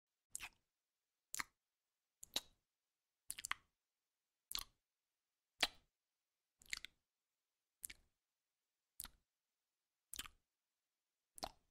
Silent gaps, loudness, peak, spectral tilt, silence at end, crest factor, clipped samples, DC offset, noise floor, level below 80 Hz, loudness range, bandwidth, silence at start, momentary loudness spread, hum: none; -49 LUFS; -18 dBFS; 0.5 dB/octave; 0.2 s; 38 dB; under 0.1%; under 0.1%; under -90 dBFS; -74 dBFS; 10 LU; 16 kHz; 0.35 s; 16 LU; none